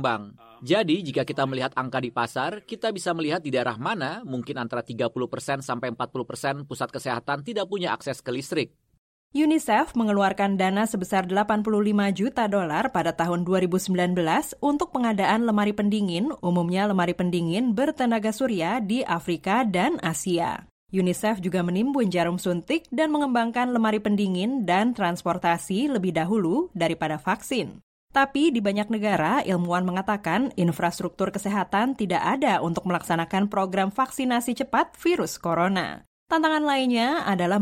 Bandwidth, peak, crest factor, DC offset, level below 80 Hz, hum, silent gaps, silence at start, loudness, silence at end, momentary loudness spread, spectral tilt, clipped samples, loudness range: 16.5 kHz; -6 dBFS; 18 dB; under 0.1%; -58 dBFS; none; 8.98-9.30 s, 20.71-20.87 s, 27.83-28.07 s, 36.07-36.26 s; 0 s; -25 LUFS; 0 s; 7 LU; -5.5 dB/octave; under 0.1%; 5 LU